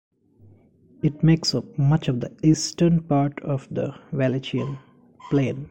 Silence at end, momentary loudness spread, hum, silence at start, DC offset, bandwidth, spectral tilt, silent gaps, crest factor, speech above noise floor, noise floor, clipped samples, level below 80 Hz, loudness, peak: 0 s; 10 LU; none; 1.05 s; under 0.1%; 9 kHz; -6.5 dB/octave; none; 16 dB; 32 dB; -54 dBFS; under 0.1%; -50 dBFS; -23 LUFS; -6 dBFS